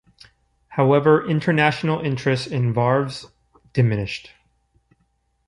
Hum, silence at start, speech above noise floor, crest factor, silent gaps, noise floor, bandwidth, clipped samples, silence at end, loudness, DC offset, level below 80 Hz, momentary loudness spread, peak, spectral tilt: none; 0.7 s; 48 dB; 20 dB; none; -67 dBFS; 11 kHz; under 0.1%; 1.25 s; -20 LUFS; under 0.1%; -54 dBFS; 13 LU; -2 dBFS; -7 dB/octave